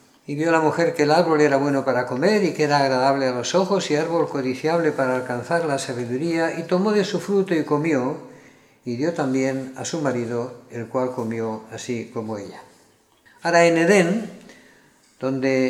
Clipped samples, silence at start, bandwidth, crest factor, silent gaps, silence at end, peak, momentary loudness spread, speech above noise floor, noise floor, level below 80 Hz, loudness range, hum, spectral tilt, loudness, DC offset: under 0.1%; 0.3 s; 14.5 kHz; 20 dB; none; 0 s; -2 dBFS; 12 LU; 36 dB; -57 dBFS; -70 dBFS; 7 LU; none; -5.5 dB/octave; -21 LUFS; under 0.1%